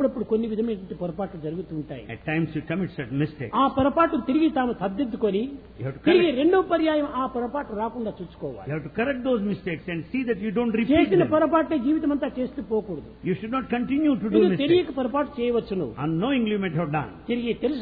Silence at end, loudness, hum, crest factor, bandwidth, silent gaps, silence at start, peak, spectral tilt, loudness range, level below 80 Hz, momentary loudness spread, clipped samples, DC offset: 0 s; -25 LUFS; none; 18 dB; 4.9 kHz; none; 0 s; -6 dBFS; -10.5 dB/octave; 5 LU; -50 dBFS; 12 LU; under 0.1%; under 0.1%